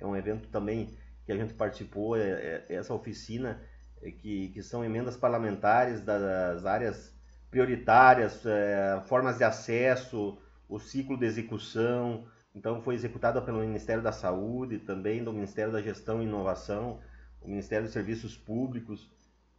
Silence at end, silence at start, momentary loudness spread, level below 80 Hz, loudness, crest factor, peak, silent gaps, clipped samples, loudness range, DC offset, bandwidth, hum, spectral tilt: 0.55 s; 0 s; 13 LU; -54 dBFS; -30 LUFS; 24 dB; -6 dBFS; none; under 0.1%; 9 LU; under 0.1%; 7.8 kHz; none; -7 dB/octave